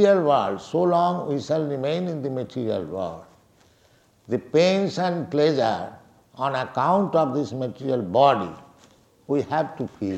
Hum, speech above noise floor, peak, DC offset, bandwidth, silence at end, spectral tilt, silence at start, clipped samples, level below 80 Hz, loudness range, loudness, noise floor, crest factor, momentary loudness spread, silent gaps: none; 37 dB; -4 dBFS; under 0.1%; 9.2 kHz; 0 s; -6.5 dB/octave; 0 s; under 0.1%; -64 dBFS; 4 LU; -23 LUFS; -59 dBFS; 18 dB; 11 LU; none